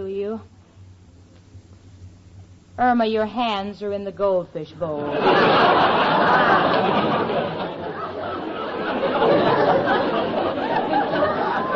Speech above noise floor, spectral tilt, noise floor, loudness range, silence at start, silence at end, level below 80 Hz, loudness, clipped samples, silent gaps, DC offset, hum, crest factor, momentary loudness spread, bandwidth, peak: 28 dB; -3 dB/octave; -48 dBFS; 7 LU; 0 s; 0 s; -56 dBFS; -20 LUFS; under 0.1%; none; under 0.1%; none; 16 dB; 13 LU; 7.6 kHz; -6 dBFS